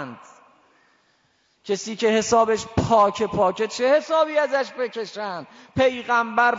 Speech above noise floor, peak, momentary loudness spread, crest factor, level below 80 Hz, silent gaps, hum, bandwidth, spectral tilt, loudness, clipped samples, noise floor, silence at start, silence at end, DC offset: 43 dB; -6 dBFS; 13 LU; 16 dB; -54 dBFS; none; none; 7.8 kHz; -4.5 dB/octave; -21 LUFS; under 0.1%; -65 dBFS; 0 s; 0 s; under 0.1%